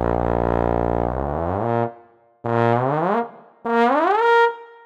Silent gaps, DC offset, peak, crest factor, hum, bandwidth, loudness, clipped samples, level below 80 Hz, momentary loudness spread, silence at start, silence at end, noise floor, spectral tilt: none; under 0.1%; -4 dBFS; 16 dB; none; 8 kHz; -20 LUFS; under 0.1%; -36 dBFS; 8 LU; 0 s; 0.15 s; -50 dBFS; -8 dB/octave